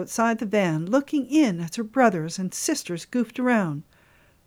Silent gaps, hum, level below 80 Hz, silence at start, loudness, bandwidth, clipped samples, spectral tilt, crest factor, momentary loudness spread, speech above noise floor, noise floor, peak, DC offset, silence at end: none; none; -66 dBFS; 0 s; -24 LUFS; 18.5 kHz; under 0.1%; -5 dB/octave; 18 dB; 8 LU; 34 dB; -58 dBFS; -6 dBFS; under 0.1%; 0.65 s